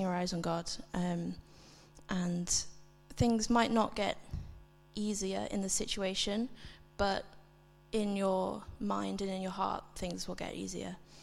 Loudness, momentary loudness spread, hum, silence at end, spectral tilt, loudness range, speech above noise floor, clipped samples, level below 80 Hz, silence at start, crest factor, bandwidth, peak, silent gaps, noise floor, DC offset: -35 LUFS; 15 LU; none; 0 s; -4 dB/octave; 3 LU; 26 dB; under 0.1%; -54 dBFS; 0 s; 20 dB; 15 kHz; -16 dBFS; none; -61 dBFS; under 0.1%